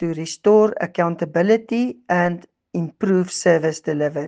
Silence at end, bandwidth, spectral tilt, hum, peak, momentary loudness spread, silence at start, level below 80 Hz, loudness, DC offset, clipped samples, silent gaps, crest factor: 0 s; 9.6 kHz; -6 dB/octave; none; -2 dBFS; 10 LU; 0 s; -66 dBFS; -19 LUFS; under 0.1%; under 0.1%; none; 16 dB